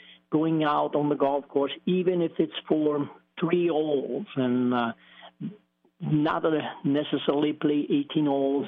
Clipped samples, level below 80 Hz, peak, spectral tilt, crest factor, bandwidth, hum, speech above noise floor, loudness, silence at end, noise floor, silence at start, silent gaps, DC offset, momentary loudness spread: under 0.1%; -72 dBFS; -10 dBFS; -5.5 dB/octave; 16 dB; 4.2 kHz; none; 29 dB; -26 LUFS; 0 s; -55 dBFS; 0.3 s; none; under 0.1%; 8 LU